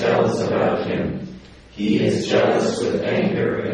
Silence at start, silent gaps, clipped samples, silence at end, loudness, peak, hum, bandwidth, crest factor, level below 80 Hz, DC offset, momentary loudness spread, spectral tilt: 0 s; none; under 0.1%; 0 s; -20 LUFS; -4 dBFS; none; 10.5 kHz; 16 dB; -50 dBFS; under 0.1%; 8 LU; -6 dB/octave